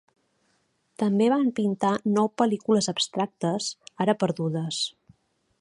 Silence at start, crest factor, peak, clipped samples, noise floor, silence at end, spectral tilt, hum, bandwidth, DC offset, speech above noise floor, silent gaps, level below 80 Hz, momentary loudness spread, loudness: 1 s; 20 dB; -6 dBFS; under 0.1%; -70 dBFS; 0.7 s; -5 dB/octave; none; 11.5 kHz; under 0.1%; 46 dB; none; -72 dBFS; 7 LU; -25 LUFS